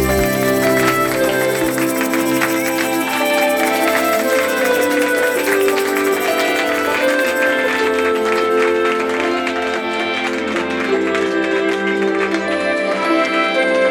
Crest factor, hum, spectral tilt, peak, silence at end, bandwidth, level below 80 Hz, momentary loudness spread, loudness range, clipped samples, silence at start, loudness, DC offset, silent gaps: 14 dB; none; -3.5 dB/octave; -2 dBFS; 0 s; over 20 kHz; -42 dBFS; 3 LU; 2 LU; under 0.1%; 0 s; -16 LUFS; under 0.1%; none